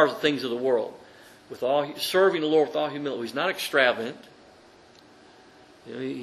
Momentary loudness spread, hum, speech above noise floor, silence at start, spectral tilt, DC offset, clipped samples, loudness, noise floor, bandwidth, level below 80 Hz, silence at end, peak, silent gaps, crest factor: 14 LU; none; 28 dB; 0 s; -4 dB/octave; under 0.1%; under 0.1%; -25 LUFS; -53 dBFS; 13 kHz; -72 dBFS; 0 s; -6 dBFS; none; 22 dB